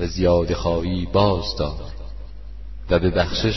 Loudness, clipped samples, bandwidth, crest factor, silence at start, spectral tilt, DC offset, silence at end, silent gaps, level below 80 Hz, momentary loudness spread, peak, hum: -21 LUFS; under 0.1%; 6.2 kHz; 18 dB; 0 s; -6.5 dB/octave; 1%; 0 s; none; -32 dBFS; 20 LU; -4 dBFS; none